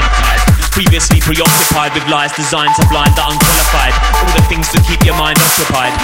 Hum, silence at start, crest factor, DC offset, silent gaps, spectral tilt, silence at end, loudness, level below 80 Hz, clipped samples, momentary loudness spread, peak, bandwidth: none; 0 s; 10 dB; under 0.1%; none; -3.5 dB/octave; 0 s; -10 LUFS; -16 dBFS; under 0.1%; 4 LU; 0 dBFS; 17.5 kHz